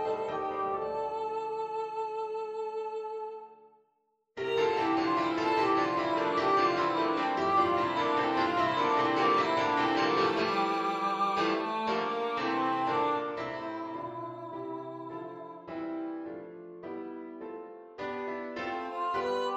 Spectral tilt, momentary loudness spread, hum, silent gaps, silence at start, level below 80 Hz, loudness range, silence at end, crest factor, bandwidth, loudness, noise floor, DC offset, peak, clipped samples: -5 dB/octave; 15 LU; none; none; 0 s; -70 dBFS; 12 LU; 0 s; 16 dB; 8.2 kHz; -30 LUFS; -75 dBFS; under 0.1%; -14 dBFS; under 0.1%